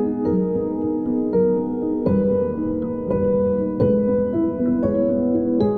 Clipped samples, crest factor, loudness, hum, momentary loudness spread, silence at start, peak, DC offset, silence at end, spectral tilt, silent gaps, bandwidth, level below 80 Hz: under 0.1%; 12 dB; -21 LUFS; none; 4 LU; 0 s; -8 dBFS; under 0.1%; 0 s; -12 dB/octave; none; 4.6 kHz; -44 dBFS